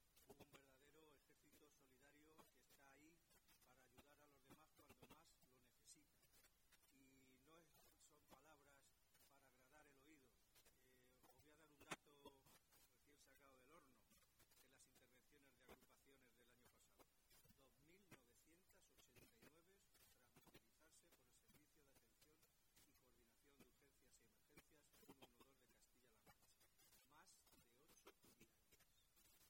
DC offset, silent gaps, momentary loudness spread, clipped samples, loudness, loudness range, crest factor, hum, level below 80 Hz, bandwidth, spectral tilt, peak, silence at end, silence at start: under 0.1%; none; 10 LU; under 0.1%; -64 LUFS; 0 LU; 34 dB; none; -88 dBFS; 16 kHz; -3 dB/octave; -40 dBFS; 0 s; 0 s